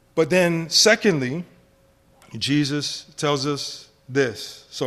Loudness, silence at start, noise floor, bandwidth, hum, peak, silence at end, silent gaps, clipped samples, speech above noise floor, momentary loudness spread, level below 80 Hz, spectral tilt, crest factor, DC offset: -21 LUFS; 0.15 s; -57 dBFS; 15 kHz; none; -4 dBFS; 0 s; none; under 0.1%; 36 dB; 17 LU; -60 dBFS; -3.5 dB/octave; 20 dB; under 0.1%